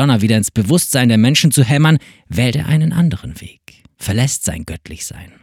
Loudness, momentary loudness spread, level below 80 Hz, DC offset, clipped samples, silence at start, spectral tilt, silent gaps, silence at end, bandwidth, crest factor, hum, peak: -14 LUFS; 16 LU; -40 dBFS; under 0.1%; under 0.1%; 0 s; -5 dB/octave; none; 0.2 s; 17 kHz; 14 dB; none; 0 dBFS